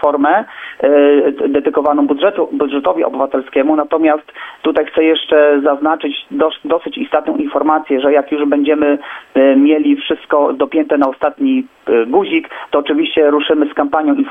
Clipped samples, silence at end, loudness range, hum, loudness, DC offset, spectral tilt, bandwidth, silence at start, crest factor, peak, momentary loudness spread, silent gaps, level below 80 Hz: under 0.1%; 0 s; 2 LU; none; -13 LUFS; under 0.1%; -7 dB/octave; 3.8 kHz; 0 s; 12 dB; 0 dBFS; 7 LU; none; -56 dBFS